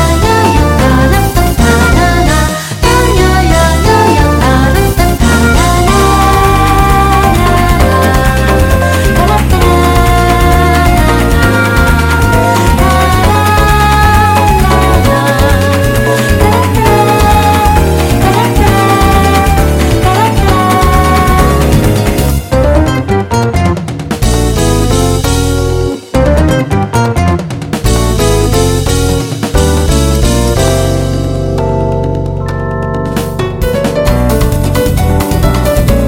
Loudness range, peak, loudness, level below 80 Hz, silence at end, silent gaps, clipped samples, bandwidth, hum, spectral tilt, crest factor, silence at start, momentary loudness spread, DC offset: 4 LU; 0 dBFS; -9 LUFS; -14 dBFS; 0 s; none; 2%; 17 kHz; none; -5.5 dB/octave; 8 dB; 0 s; 5 LU; under 0.1%